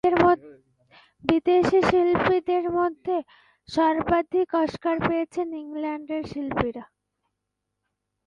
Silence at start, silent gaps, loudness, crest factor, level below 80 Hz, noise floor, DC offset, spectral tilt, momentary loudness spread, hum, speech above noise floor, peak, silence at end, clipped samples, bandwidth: 0.05 s; none; -24 LUFS; 20 dB; -52 dBFS; -81 dBFS; under 0.1%; -7 dB/octave; 11 LU; none; 58 dB; -4 dBFS; 1.4 s; under 0.1%; 9.2 kHz